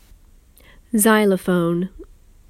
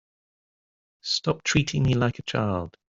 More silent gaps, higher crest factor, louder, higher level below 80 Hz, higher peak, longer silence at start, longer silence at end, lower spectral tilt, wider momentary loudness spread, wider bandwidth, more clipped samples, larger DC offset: neither; about the same, 20 dB vs 20 dB; first, -18 LUFS vs -25 LUFS; about the same, -48 dBFS vs -48 dBFS; first, -2 dBFS vs -8 dBFS; about the same, 0.95 s vs 1.05 s; first, 0.45 s vs 0.2 s; about the same, -5 dB/octave vs -5 dB/octave; first, 10 LU vs 5 LU; first, 16 kHz vs 7.8 kHz; neither; neither